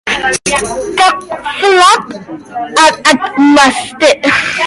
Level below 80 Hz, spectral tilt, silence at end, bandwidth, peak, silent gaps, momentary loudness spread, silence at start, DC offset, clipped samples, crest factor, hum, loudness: -42 dBFS; -2 dB/octave; 0 s; 16 kHz; 0 dBFS; none; 13 LU; 0.05 s; under 0.1%; 0.2%; 10 dB; none; -9 LUFS